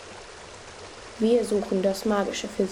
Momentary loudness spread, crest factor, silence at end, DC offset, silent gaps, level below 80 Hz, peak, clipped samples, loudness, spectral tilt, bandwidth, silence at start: 19 LU; 16 dB; 0 s; under 0.1%; none; -56 dBFS; -10 dBFS; under 0.1%; -25 LUFS; -5 dB/octave; 17 kHz; 0 s